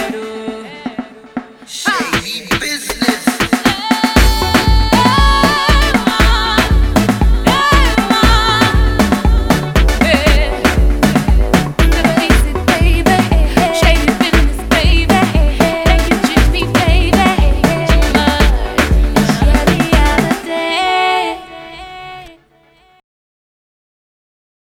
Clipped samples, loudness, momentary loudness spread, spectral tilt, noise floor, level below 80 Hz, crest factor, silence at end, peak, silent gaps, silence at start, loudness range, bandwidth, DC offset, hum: under 0.1%; -12 LUFS; 11 LU; -5 dB/octave; -50 dBFS; -16 dBFS; 12 dB; 2.5 s; 0 dBFS; none; 0 s; 5 LU; 16.5 kHz; under 0.1%; none